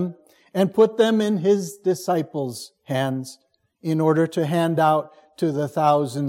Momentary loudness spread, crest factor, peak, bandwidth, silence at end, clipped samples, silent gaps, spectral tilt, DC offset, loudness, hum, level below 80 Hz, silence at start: 12 LU; 16 dB; -4 dBFS; 16.5 kHz; 0 s; under 0.1%; none; -6.5 dB/octave; under 0.1%; -22 LUFS; none; -70 dBFS; 0 s